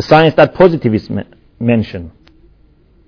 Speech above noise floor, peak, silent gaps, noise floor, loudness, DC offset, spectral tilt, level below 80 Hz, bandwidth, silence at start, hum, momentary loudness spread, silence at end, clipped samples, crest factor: 37 dB; 0 dBFS; none; -48 dBFS; -12 LUFS; under 0.1%; -8 dB/octave; -42 dBFS; 5.4 kHz; 0 s; none; 15 LU; 1 s; 1%; 14 dB